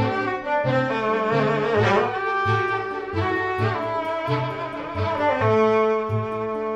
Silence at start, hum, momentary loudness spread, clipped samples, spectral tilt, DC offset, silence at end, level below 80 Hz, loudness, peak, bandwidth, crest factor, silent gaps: 0 s; none; 7 LU; under 0.1%; -7 dB/octave; under 0.1%; 0 s; -52 dBFS; -22 LUFS; -8 dBFS; 8.4 kHz; 16 dB; none